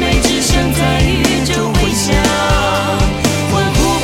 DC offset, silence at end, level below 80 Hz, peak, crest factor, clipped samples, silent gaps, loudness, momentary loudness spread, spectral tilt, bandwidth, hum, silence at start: under 0.1%; 0 s; -20 dBFS; -2 dBFS; 12 dB; under 0.1%; none; -13 LUFS; 2 LU; -4 dB/octave; 16.5 kHz; none; 0 s